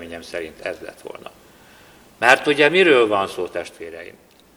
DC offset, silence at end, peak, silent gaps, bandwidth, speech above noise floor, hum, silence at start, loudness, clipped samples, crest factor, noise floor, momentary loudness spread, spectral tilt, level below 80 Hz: under 0.1%; 0.5 s; 0 dBFS; none; 19.5 kHz; 29 dB; none; 0 s; -17 LUFS; under 0.1%; 20 dB; -48 dBFS; 23 LU; -4 dB/octave; -60 dBFS